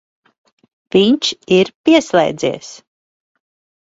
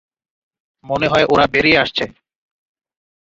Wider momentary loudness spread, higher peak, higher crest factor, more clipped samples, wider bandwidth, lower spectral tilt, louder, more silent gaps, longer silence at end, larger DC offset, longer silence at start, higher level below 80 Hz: about the same, 9 LU vs 11 LU; about the same, 0 dBFS vs 0 dBFS; about the same, 16 dB vs 18 dB; neither; about the same, 8 kHz vs 7.8 kHz; about the same, -4.5 dB/octave vs -5 dB/octave; about the same, -14 LUFS vs -15 LUFS; first, 1.75-1.84 s vs none; about the same, 1.05 s vs 1.15 s; neither; about the same, 0.95 s vs 0.85 s; second, -56 dBFS vs -46 dBFS